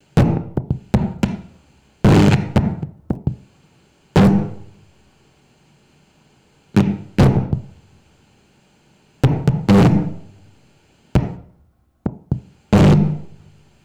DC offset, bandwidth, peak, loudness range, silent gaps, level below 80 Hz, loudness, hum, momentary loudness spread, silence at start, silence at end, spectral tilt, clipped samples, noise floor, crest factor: under 0.1%; 12.5 kHz; -4 dBFS; 4 LU; none; -34 dBFS; -18 LUFS; none; 17 LU; 0.15 s; 0.55 s; -8 dB/octave; under 0.1%; -57 dBFS; 14 dB